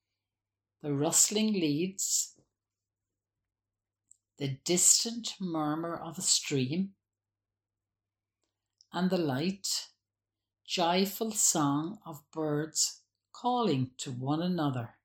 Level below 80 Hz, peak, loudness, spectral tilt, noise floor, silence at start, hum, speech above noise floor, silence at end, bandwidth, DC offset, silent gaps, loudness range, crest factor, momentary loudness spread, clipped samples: -76 dBFS; -8 dBFS; -29 LUFS; -3 dB/octave; under -90 dBFS; 0.85 s; none; over 60 dB; 0.15 s; 17 kHz; under 0.1%; none; 7 LU; 24 dB; 14 LU; under 0.1%